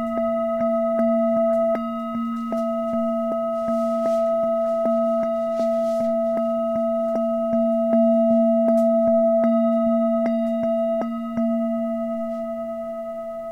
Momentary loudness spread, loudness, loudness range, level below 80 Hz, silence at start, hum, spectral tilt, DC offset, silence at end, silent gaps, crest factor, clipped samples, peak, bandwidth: 9 LU; -22 LUFS; 4 LU; -58 dBFS; 0 s; none; -8 dB/octave; 0.2%; 0 s; none; 12 dB; under 0.1%; -8 dBFS; 7.2 kHz